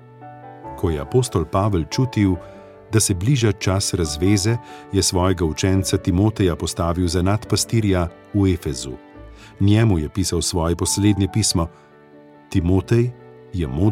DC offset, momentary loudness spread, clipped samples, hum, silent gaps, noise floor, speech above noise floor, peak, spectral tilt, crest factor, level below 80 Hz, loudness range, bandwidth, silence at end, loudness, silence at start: under 0.1%; 9 LU; under 0.1%; none; none; -46 dBFS; 27 dB; -4 dBFS; -5.5 dB/octave; 16 dB; -38 dBFS; 2 LU; 15.5 kHz; 0 s; -20 LUFS; 0.2 s